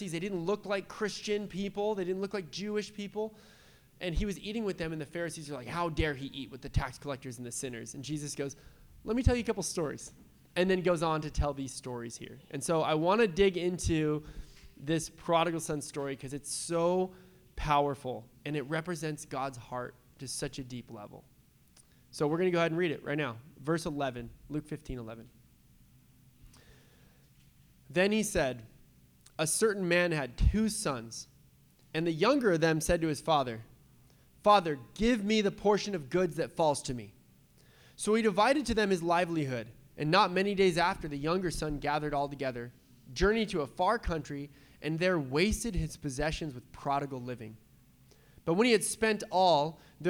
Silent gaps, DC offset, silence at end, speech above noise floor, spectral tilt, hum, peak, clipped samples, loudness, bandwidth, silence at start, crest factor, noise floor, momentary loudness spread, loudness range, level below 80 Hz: none; under 0.1%; 0 s; 31 dB; -5 dB/octave; none; -10 dBFS; under 0.1%; -32 LUFS; over 20 kHz; 0 s; 22 dB; -62 dBFS; 15 LU; 8 LU; -46 dBFS